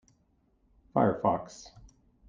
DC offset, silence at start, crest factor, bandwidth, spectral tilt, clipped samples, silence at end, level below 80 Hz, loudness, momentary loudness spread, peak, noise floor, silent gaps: under 0.1%; 0.95 s; 22 dB; 9.4 kHz; -7.5 dB/octave; under 0.1%; 0.6 s; -62 dBFS; -29 LUFS; 20 LU; -10 dBFS; -70 dBFS; none